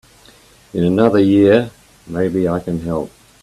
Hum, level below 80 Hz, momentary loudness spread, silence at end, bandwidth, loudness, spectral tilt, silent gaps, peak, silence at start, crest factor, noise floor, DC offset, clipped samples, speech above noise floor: none; -48 dBFS; 16 LU; 0.35 s; 13 kHz; -15 LUFS; -8 dB/octave; none; 0 dBFS; 0.75 s; 16 dB; -47 dBFS; under 0.1%; under 0.1%; 32 dB